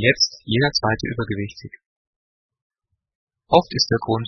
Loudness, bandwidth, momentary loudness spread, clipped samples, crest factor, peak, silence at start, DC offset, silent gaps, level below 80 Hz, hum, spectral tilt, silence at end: -20 LUFS; 6.6 kHz; 11 LU; under 0.1%; 22 dB; 0 dBFS; 0 s; under 0.1%; 1.86-2.49 s, 2.62-2.70 s, 3.15-3.27 s; -50 dBFS; none; -4.5 dB/octave; 0 s